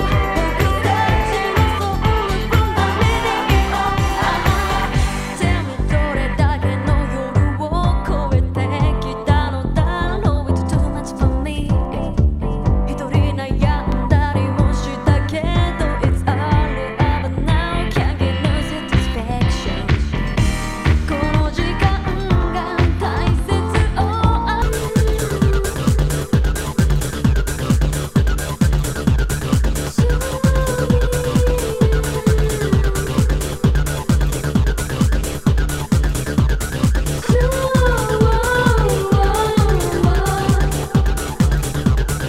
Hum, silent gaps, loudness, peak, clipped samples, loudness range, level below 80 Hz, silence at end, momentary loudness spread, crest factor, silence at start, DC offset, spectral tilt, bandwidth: none; none; -18 LUFS; 0 dBFS; under 0.1%; 2 LU; -20 dBFS; 0 s; 3 LU; 16 dB; 0 s; under 0.1%; -6 dB/octave; 16 kHz